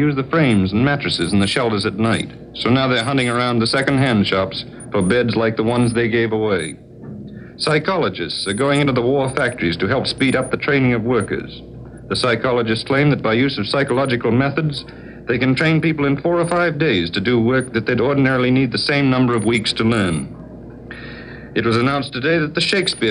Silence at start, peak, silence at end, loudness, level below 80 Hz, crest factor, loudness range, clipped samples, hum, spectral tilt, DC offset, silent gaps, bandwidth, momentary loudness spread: 0 s; -2 dBFS; 0 s; -17 LUFS; -46 dBFS; 16 dB; 3 LU; under 0.1%; none; -5.5 dB/octave; under 0.1%; none; 10.5 kHz; 13 LU